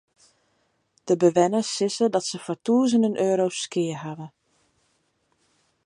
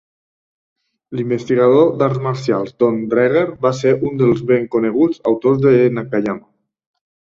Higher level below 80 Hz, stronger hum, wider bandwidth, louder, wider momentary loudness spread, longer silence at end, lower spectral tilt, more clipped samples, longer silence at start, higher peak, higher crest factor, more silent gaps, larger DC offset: second, -76 dBFS vs -56 dBFS; neither; first, 11.5 kHz vs 7.6 kHz; second, -23 LUFS vs -16 LUFS; first, 16 LU vs 8 LU; first, 1.55 s vs 0.9 s; second, -5 dB/octave vs -8 dB/octave; neither; about the same, 1.05 s vs 1.1 s; second, -6 dBFS vs -2 dBFS; first, 20 dB vs 14 dB; neither; neither